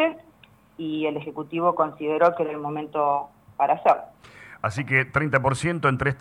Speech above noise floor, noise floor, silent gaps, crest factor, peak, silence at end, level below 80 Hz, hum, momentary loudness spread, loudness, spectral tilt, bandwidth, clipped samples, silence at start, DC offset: 31 dB; -55 dBFS; none; 18 dB; -6 dBFS; 0.05 s; -54 dBFS; none; 11 LU; -24 LUFS; -6.5 dB/octave; 12 kHz; under 0.1%; 0 s; under 0.1%